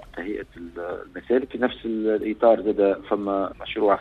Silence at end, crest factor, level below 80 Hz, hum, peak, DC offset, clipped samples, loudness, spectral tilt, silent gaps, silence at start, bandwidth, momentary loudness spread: 0 s; 18 dB; -52 dBFS; none; -6 dBFS; under 0.1%; under 0.1%; -24 LUFS; -7.5 dB/octave; none; 0 s; 4.7 kHz; 14 LU